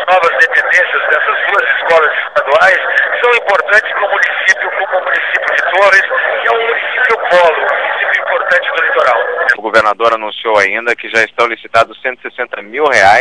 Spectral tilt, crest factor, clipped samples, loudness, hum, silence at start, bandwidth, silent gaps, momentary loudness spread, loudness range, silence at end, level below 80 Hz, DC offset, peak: -2 dB/octave; 12 dB; 0.8%; -10 LUFS; none; 0 s; 11 kHz; none; 6 LU; 2 LU; 0 s; -52 dBFS; 0.4%; 0 dBFS